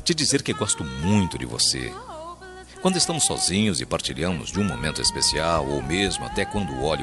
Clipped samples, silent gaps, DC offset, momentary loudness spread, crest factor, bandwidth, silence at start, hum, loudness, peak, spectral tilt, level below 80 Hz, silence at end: under 0.1%; none; under 0.1%; 10 LU; 16 dB; 12.5 kHz; 0 s; none; -23 LUFS; -8 dBFS; -3.5 dB/octave; -42 dBFS; 0 s